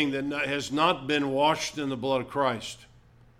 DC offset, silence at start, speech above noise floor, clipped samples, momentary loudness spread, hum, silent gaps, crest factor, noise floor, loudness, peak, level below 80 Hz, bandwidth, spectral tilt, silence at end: under 0.1%; 0 s; 29 dB; under 0.1%; 8 LU; none; none; 18 dB; -56 dBFS; -27 LUFS; -10 dBFS; -60 dBFS; 15 kHz; -4 dB/octave; 0.55 s